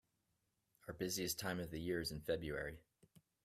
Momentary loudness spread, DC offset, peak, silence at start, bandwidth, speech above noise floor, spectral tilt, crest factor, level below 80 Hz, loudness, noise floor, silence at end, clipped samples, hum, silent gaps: 13 LU; under 0.1%; -26 dBFS; 0.85 s; 16 kHz; 42 dB; -4 dB/octave; 20 dB; -64 dBFS; -43 LUFS; -85 dBFS; 0.65 s; under 0.1%; none; none